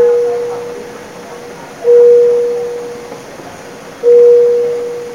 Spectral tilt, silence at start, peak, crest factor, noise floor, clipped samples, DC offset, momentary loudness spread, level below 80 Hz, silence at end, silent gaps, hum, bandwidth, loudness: -4.5 dB/octave; 0 s; 0 dBFS; 12 dB; -30 dBFS; under 0.1%; 0.2%; 23 LU; -56 dBFS; 0 s; none; none; 10.5 kHz; -10 LUFS